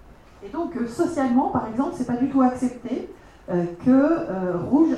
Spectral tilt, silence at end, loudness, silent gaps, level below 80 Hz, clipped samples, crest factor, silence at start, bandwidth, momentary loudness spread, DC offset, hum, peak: -7.5 dB/octave; 0 s; -23 LUFS; none; -52 dBFS; under 0.1%; 16 dB; 0.4 s; 10.5 kHz; 12 LU; under 0.1%; none; -8 dBFS